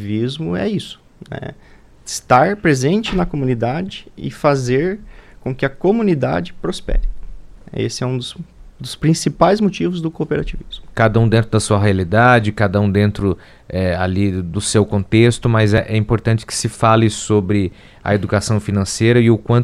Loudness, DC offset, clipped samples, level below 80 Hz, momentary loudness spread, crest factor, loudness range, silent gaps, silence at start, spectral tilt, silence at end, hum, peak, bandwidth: -17 LUFS; under 0.1%; under 0.1%; -32 dBFS; 15 LU; 16 dB; 5 LU; none; 0 s; -6 dB/octave; 0 s; none; 0 dBFS; 13 kHz